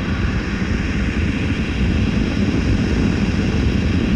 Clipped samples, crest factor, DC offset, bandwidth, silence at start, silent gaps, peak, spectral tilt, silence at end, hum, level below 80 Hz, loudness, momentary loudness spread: under 0.1%; 12 dB; under 0.1%; 9.6 kHz; 0 s; none; -6 dBFS; -7 dB/octave; 0 s; none; -24 dBFS; -19 LUFS; 3 LU